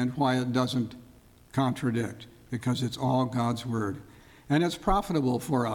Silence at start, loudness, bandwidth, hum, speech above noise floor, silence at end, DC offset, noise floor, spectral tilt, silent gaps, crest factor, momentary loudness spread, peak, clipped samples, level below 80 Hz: 0 s; -29 LUFS; 18 kHz; none; 27 dB; 0 s; under 0.1%; -55 dBFS; -6.5 dB/octave; none; 16 dB; 9 LU; -12 dBFS; under 0.1%; -46 dBFS